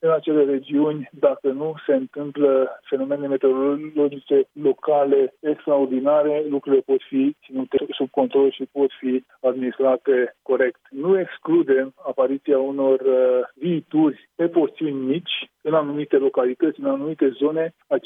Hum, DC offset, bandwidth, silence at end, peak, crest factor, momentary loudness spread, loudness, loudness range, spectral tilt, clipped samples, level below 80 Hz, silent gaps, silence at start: none; under 0.1%; 3.8 kHz; 0.05 s; -4 dBFS; 16 dB; 6 LU; -21 LUFS; 2 LU; -9 dB/octave; under 0.1%; -74 dBFS; none; 0.05 s